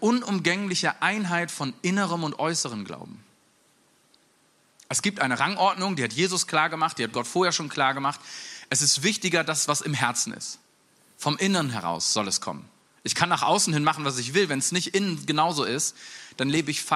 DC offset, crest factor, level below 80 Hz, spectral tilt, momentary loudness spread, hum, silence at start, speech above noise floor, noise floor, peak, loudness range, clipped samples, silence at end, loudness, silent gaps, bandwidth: under 0.1%; 22 dB; -72 dBFS; -3 dB/octave; 10 LU; none; 0 s; 38 dB; -63 dBFS; -4 dBFS; 5 LU; under 0.1%; 0 s; -25 LUFS; none; 14.5 kHz